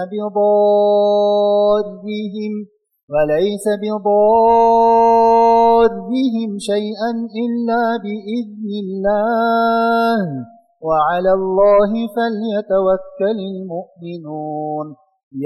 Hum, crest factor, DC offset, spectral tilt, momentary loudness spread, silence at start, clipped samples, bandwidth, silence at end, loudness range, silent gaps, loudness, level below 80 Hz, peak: none; 12 dB; under 0.1%; -6.5 dB/octave; 14 LU; 0 s; under 0.1%; 12.5 kHz; 0 s; 7 LU; 3.03-3.08 s, 15.23-15.31 s; -16 LUFS; -50 dBFS; -4 dBFS